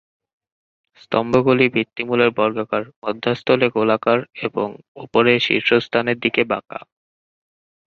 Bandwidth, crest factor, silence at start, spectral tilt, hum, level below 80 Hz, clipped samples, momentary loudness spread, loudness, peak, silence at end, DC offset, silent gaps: 7 kHz; 18 dB; 1.1 s; -6.5 dB/octave; none; -58 dBFS; under 0.1%; 10 LU; -19 LUFS; -2 dBFS; 1.15 s; under 0.1%; 2.96-3.02 s, 4.88-4.95 s